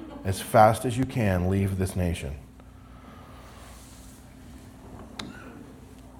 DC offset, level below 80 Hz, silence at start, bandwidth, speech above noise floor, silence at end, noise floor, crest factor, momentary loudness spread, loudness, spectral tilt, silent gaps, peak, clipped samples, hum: under 0.1%; -48 dBFS; 0 s; 17 kHz; 24 dB; 0.1 s; -48 dBFS; 24 dB; 27 LU; -25 LUFS; -6.5 dB/octave; none; -4 dBFS; under 0.1%; none